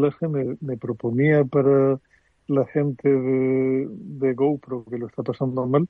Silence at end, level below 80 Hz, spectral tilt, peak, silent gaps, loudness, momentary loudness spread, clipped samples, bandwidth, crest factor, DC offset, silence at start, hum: 0.05 s; -64 dBFS; -11.5 dB/octave; -6 dBFS; none; -23 LUFS; 11 LU; under 0.1%; 4.4 kHz; 16 dB; under 0.1%; 0 s; none